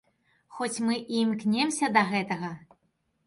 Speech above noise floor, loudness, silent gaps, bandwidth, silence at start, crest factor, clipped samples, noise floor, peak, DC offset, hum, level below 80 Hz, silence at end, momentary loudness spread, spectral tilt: 47 dB; -27 LUFS; none; 11.5 kHz; 0.5 s; 20 dB; under 0.1%; -74 dBFS; -8 dBFS; under 0.1%; none; -72 dBFS; 0.6 s; 11 LU; -4 dB/octave